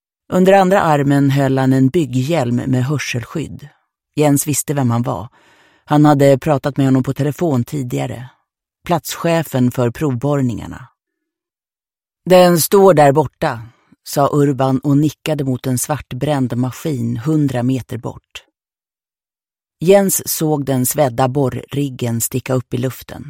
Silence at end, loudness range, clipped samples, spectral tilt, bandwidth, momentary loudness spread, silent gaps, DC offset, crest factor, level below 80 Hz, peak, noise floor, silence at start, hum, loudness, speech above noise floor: 0 s; 6 LU; under 0.1%; -6 dB/octave; 16.5 kHz; 12 LU; none; under 0.1%; 16 dB; -48 dBFS; 0 dBFS; under -90 dBFS; 0.3 s; none; -15 LUFS; over 75 dB